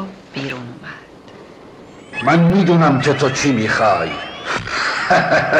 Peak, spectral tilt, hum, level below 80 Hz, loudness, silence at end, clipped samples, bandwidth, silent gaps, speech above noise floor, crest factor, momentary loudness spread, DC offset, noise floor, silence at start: -4 dBFS; -5.5 dB/octave; none; -46 dBFS; -16 LUFS; 0 s; under 0.1%; 9.6 kHz; none; 25 dB; 12 dB; 16 LU; under 0.1%; -39 dBFS; 0 s